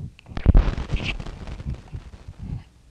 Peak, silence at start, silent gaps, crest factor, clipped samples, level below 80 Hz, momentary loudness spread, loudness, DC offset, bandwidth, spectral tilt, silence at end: -2 dBFS; 0 s; none; 22 dB; under 0.1%; -24 dBFS; 19 LU; -27 LUFS; under 0.1%; 7.8 kHz; -7 dB/octave; 0.3 s